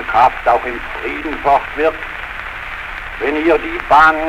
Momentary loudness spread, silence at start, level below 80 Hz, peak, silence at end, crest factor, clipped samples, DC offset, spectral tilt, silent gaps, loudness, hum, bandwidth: 13 LU; 0 s; -36 dBFS; -2 dBFS; 0 s; 14 dB; under 0.1%; under 0.1%; -5 dB/octave; none; -16 LUFS; none; 16 kHz